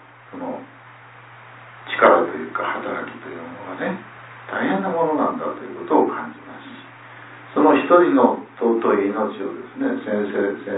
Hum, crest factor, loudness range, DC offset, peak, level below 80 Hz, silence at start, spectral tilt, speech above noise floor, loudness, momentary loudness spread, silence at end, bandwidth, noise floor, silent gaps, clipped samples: none; 20 dB; 5 LU; under 0.1%; 0 dBFS; -70 dBFS; 0.3 s; -10 dB/octave; 24 dB; -20 LUFS; 24 LU; 0 s; 4 kHz; -44 dBFS; none; under 0.1%